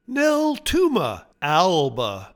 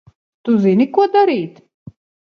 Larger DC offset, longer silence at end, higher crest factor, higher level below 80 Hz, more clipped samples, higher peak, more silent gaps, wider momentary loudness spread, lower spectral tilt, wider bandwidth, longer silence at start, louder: neither; second, 0.1 s vs 0.85 s; about the same, 16 dB vs 16 dB; first, -44 dBFS vs -62 dBFS; neither; second, -4 dBFS vs 0 dBFS; neither; second, 9 LU vs 13 LU; second, -4.5 dB/octave vs -8.5 dB/octave; first, 19 kHz vs 6.4 kHz; second, 0.1 s vs 0.45 s; second, -21 LUFS vs -15 LUFS